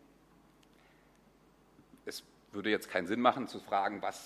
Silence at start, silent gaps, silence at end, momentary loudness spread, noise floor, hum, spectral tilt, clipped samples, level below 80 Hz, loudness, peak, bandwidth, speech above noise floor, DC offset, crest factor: 2.05 s; none; 0 s; 17 LU; -65 dBFS; none; -4 dB/octave; under 0.1%; -72 dBFS; -34 LUFS; -12 dBFS; 15.5 kHz; 31 dB; under 0.1%; 26 dB